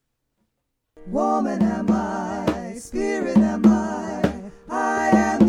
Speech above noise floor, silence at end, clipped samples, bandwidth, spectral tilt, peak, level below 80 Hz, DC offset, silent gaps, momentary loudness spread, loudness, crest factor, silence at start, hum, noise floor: 55 dB; 0 s; under 0.1%; 11 kHz; -6.5 dB/octave; -2 dBFS; -44 dBFS; under 0.1%; none; 11 LU; -22 LUFS; 18 dB; 1 s; none; -76 dBFS